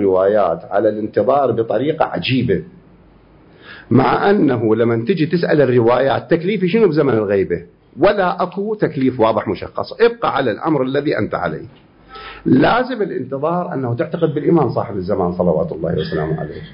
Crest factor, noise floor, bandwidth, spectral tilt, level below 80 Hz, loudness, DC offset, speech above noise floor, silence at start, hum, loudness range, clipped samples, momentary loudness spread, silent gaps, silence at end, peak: 14 dB; -47 dBFS; 5.4 kHz; -12 dB/octave; -46 dBFS; -17 LUFS; under 0.1%; 31 dB; 0 s; none; 4 LU; under 0.1%; 8 LU; none; 0 s; -2 dBFS